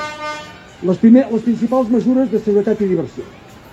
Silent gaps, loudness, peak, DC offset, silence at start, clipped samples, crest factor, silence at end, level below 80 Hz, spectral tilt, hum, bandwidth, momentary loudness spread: none; -15 LUFS; 0 dBFS; under 0.1%; 0 s; under 0.1%; 16 dB; 0.05 s; -52 dBFS; -7.5 dB/octave; none; 8 kHz; 19 LU